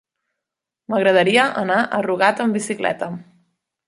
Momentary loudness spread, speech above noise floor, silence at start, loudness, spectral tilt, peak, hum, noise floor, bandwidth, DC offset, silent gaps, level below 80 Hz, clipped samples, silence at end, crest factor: 11 LU; 66 dB; 0.9 s; -18 LUFS; -4.5 dB/octave; -2 dBFS; none; -84 dBFS; 11.5 kHz; under 0.1%; none; -68 dBFS; under 0.1%; 0.65 s; 18 dB